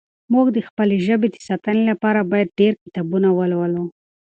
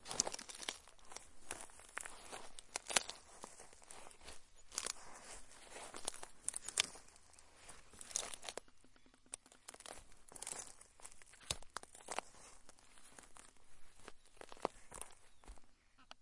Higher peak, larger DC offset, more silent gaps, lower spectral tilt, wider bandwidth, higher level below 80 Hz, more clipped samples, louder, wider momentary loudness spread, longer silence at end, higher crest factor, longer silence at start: first, -4 dBFS vs -10 dBFS; neither; first, 0.70-0.77 s, 2.81-2.86 s vs none; first, -8 dB/octave vs 0 dB/octave; second, 8.2 kHz vs 11.5 kHz; about the same, -64 dBFS vs -68 dBFS; neither; first, -19 LUFS vs -46 LUFS; second, 7 LU vs 21 LU; first, 0.35 s vs 0 s; second, 14 dB vs 38 dB; first, 0.3 s vs 0 s